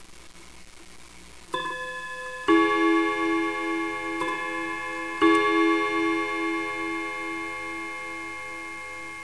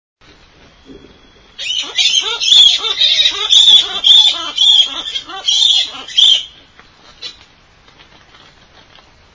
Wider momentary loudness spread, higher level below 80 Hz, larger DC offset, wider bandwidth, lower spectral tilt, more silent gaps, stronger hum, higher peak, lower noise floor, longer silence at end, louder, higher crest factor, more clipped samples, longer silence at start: second, 14 LU vs 18 LU; second, -58 dBFS vs -52 dBFS; first, 0.4% vs under 0.1%; first, 11 kHz vs 8 kHz; first, -3.5 dB/octave vs 2 dB/octave; neither; neither; second, -8 dBFS vs 0 dBFS; about the same, -48 dBFS vs -46 dBFS; second, 0 s vs 2.05 s; second, -26 LUFS vs -8 LUFS; about the same, 18 dB vs 14 dB; neither; second, 0 s vs 0.9 s